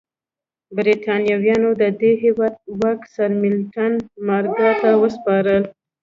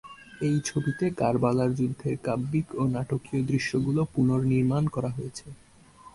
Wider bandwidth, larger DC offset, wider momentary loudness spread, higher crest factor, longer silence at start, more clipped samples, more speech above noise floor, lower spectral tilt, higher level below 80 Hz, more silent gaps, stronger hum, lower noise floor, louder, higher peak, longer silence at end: second, 7.2 kHz vs 11.5 kHz; neither; about the same, 6 LU vs 7 LU; about the same, 14 dB vs 18 dB; first, 0.7 s vs 0.05 s; neither; first, 72 dB vs 26 dB; about the same, -7.5 dB/octave vs -7 dB/octave; about the same, -58 dBFS vs -54 dBFS; neither; neither; first, -90 dBFS vs -52 dBFS; first, -18 LUFS vs -27 LUFS; first, -4 dBFS vs -10 dBFS; first, 0.3 s vs 0.05 s